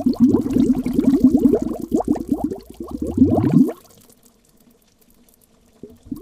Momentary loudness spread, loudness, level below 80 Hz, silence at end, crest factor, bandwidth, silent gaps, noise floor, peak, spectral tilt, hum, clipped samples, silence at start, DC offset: 15 LU; -18 LUFS; -42 dBFS; 0 s; 18 dB; 15.5 kHz; none; -55 dBFS; -2 dBFS; -9 dB/octave; none; under 0.1%; 0 s; under 0.1%